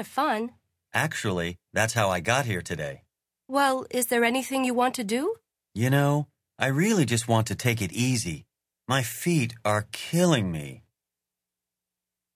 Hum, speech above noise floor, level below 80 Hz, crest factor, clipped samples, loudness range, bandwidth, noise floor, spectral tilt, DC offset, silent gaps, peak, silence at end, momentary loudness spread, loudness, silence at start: none; 62 dB; -54 dBFS; 22 dB; under 0.1%; 2 LU; 16 kHz; -88 dBFS; -5 dB/octave; under 0.1%; none; -6 dBFS; 1.6 s; 11 LU; -26 LUFS; 0 s